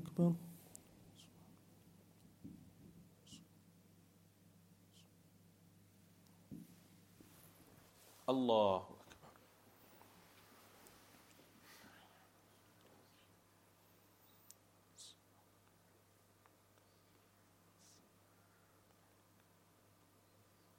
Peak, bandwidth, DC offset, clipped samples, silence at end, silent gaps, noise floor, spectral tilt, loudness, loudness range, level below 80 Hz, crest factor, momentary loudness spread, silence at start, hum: -22 dBFS; 16.5 kHz; under 0.1%; under 0.1%; 5.65 s; none; -71 dBFS; -6.5 dB/octave; -40 LUFS; 27 LU; -84 dBFS; 28 dB; 30 LU; 0 s; none